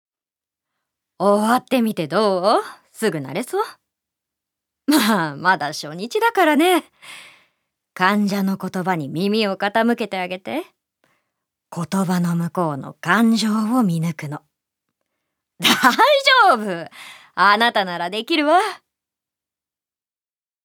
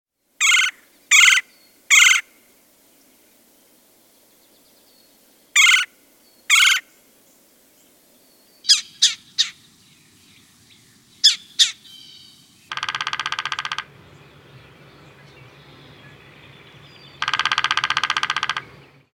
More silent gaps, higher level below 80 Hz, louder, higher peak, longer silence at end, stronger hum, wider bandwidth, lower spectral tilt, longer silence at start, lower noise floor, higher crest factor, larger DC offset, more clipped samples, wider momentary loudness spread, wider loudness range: neither; second, -76 dBFS vs -68 dBFS; about the same, -18 LUFS vs -16 LUFS; about the same, 0 dBFS vs 0 dBFS; first, 1.9 s vs 0.55 s; neither; first, 19.5 kHz vs 17 kHz; first, -4.5 dB/octave vs 3 dB/octave; first, 1.2 s vs 0.4 s; first, under -90 dBFS vs -55 dBFS; about the same, 20 dB vs 22 dB; neither; neither; about the same, 15 LU vs 15 LU; second, 6 LU vs 13 LU